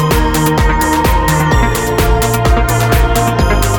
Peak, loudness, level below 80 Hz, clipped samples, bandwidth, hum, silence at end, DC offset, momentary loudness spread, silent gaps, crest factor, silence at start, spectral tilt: 0 dBFS; -12 LUFS; -16 dBFS; under 0.1%; 19 kHz; none; 0 s; under 0.1%; 1 LU; none; 10 dB; 0 s; -5 dB/octave